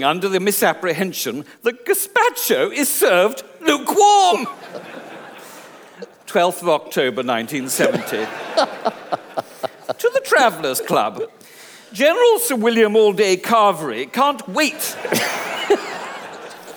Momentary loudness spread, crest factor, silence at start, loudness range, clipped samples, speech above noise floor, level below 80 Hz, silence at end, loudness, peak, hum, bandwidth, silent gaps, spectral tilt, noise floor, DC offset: 17 LU; 18 dB; 0 s; 5 LU; under 0.1%; 25 dB; -72 dBFS; 0 s; -18 LUFS; -2 dBFS; none; over 20 kHz; none; -3 dB/octave; -42 dBFS; under 0.1%